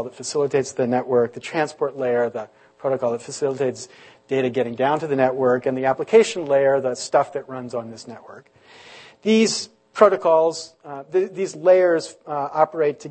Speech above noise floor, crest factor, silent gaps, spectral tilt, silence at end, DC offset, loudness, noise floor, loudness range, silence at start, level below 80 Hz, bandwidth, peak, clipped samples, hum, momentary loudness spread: 25 dB; 20 dB; none; -4.5 dB/octave; 0 s; under 0.1%; -21 LUFS; -45 dBFS; 5 LU; 0 s; -70 dBFS; 8.8 kHz; 0 dBFS; under 0.1%; none; 14 LU